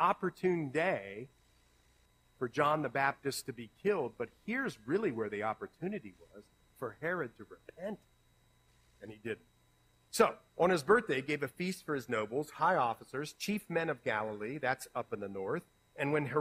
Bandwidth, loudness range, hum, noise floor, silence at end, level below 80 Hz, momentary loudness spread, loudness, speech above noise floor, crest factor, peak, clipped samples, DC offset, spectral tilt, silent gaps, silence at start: 15.5 kHz; 11 LU; none; -69 dBFS; 0 s; -72 dBFS; 14 LU; -35 LUFS; 34 dB; 22 dB; -14 dBFS; under 0.1%; under 0.1%; -5 dB/octave; none; 0 s